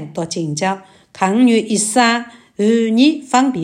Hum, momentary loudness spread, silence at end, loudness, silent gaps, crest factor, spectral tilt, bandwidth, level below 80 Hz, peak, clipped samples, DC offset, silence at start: none; 9 LU; 0 s; -15 LUFS; none; 16 dB; -4 dB/octave; 15.5 kHz; -64 dBFS; 0 dBFS; under 0.1%; under 0.1%; 0 s